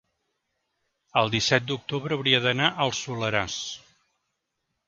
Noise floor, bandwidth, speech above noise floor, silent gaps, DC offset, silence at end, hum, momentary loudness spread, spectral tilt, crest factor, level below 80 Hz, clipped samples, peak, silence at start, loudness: -80 dBFS; 7.8 kHz; 54 dB; none; under 0.1%; 1.1 s; none; 10 LU; -3.5 dB/octave; 24 dB; -60 dBFS; under 0.1%; -4 dBFS; 1.15 s; -24 LUFS